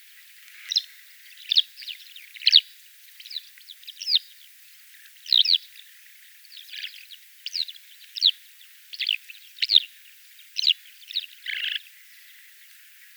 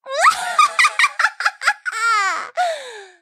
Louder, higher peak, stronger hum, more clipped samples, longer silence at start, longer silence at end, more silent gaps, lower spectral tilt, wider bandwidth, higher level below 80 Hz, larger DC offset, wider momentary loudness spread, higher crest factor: second, -22 LUFS vs -17 LUFS; about the same, -2 dBFS vs -2 dBFS; neither; neither; first, 0.55 s vs 0.05 s; first, 1.4 s vs 0.15 s; neither; second, 11 dB/octave vs 2.5 dB/octave; first, over 20 kHz vs 15.5 kHz; second, under -90 dBFS vs -74 dBFS; neither; first, 26 LU vs 9 LU; first, 28 dB vs 16 dB